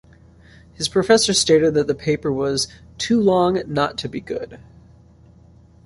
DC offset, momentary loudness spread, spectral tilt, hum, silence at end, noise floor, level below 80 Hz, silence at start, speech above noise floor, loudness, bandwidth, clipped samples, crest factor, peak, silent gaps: under 0.1%; 14 LU; -4 dB/octave; none; 1.3 s; -49 dBFS; -48 dBFS; 0.8 s; 30 dB; -19 LUFS; 11.5 kHz; under 0.1%; 18 dB; -2 dBFS; none